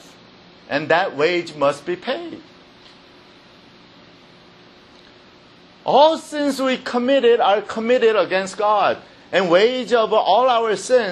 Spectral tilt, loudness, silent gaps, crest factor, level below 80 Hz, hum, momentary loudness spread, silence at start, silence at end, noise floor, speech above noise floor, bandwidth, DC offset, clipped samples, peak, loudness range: -4 dB/octave; -18 LUFS; none; 18 dB; -66 dBFS; none; 11 LU; 0.7 s; 0 s; -48 dBFS; 30 dB; 12 kHz; under 0.1%; under 0.1%; -2 dBFS; 11 LU